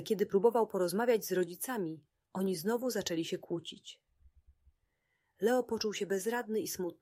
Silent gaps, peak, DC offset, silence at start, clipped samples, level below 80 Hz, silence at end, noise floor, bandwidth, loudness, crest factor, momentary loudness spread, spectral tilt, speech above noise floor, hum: none; -14 dBFS; under 0.1%; 0 s; under 0.1%; -72 dBFS; 0.1 s; -80 dBFS; 16 kHz; -34 LUFS; 20 dB; 12 LU; -4.5 dB/octave; 47 dB; none